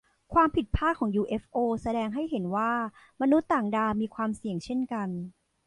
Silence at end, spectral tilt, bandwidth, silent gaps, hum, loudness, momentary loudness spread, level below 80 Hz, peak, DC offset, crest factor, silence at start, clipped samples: 0.35 s; -7.5 dB/octave; 11 kHz; none; none; -28 LUFS; 8 LU; -46 dBFS; -12 dBFS; under 0.1%; 16 dB; 0.3 s; under 0.1%